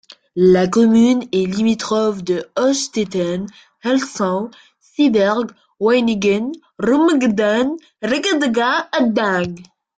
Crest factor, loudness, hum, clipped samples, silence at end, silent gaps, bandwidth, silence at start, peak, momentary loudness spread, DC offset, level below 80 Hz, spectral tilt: 14 dB; -17 LUFS; none; under 0.1%; 0.35 s; none; 9.2 kHz; 0.1 s; -2 dBFS; 13 LU; under 0.1%; -56 dBFS; -5 dB/octave